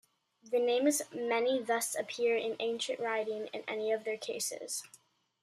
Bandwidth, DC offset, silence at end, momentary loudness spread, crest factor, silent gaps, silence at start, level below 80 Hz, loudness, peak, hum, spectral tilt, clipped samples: 15 kHz; under 0.1%; 0.55 s; 8 LU; 18 dB; none; 0.45 s; -88 dBFS; -33 LUFS; -18 dBFS; none; -1.5 dB/octave; under 0.1%